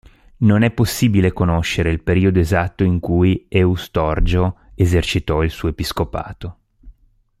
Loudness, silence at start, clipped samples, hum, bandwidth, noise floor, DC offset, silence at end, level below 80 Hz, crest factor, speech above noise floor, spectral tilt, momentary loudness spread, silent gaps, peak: -18 LUFS; 0.4 s; under 0.1%; none; 15.5 kHz; -54 dBFS; under 0.1%; 0.5 s; -30 dBFS; 16 dB; 37 dB; -6.5 dB/octave; 7 LU; none; -2 dBFS